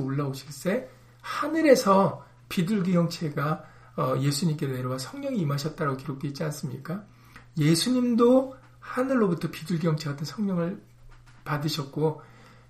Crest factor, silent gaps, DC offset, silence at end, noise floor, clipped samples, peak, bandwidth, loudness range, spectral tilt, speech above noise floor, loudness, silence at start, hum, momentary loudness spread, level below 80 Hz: 22 dB; none; under 0.1%; 0.45 s; -50 dBFS; under 0.1%; -4 dBFS; 15.5 kHz; 5 LU; -6 dB/octave; 24 dB; -27 LUFS; 0 s; none; 15 LU; -60 dBFS